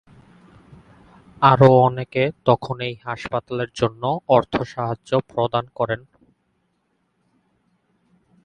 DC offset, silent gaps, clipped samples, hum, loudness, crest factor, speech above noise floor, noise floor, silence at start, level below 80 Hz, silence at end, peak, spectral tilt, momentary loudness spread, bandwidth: under 0.1%; none; under 0.1%; none; -20 LUFS; 22 dB; 50 dB; -69 dBFS; 1.4 s; -54 dBFS; 2.45 s; 0 dBFS; -7.5 dB/octave; 14 LU; 9.2 kHz